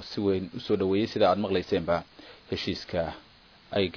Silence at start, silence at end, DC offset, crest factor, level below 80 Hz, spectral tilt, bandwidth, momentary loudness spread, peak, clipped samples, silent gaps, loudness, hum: 0 s; 0 s; under 0.1%; 18 dB; -56 dBFS; -6.5 dB/octave; 5.4 kHz; 12 LU; -10 dBFS; under 0.1%; none; -28 LUFS; none